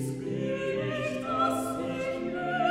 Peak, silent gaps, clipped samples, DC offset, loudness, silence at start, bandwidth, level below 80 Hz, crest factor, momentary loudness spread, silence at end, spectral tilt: -14 dBFS; none; under 0.1%; under 0.1%; -31 LUFS; 0 s; 16 kHz; -60 dBFS; 16 dB; 5 LU; 0 s; -5.5 dB/octave